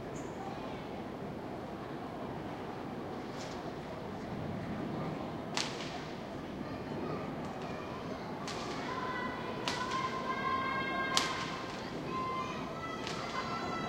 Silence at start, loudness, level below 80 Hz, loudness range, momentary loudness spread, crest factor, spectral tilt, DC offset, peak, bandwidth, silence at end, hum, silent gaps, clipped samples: 0 s; -38 LUFS; -60 dBFS; 7 LU; 8 LU; 32 dB; -4.5 dB/octave; under 0.1%; -6 dBFS; 16 kHz; 0 s; none; none; under 0.1%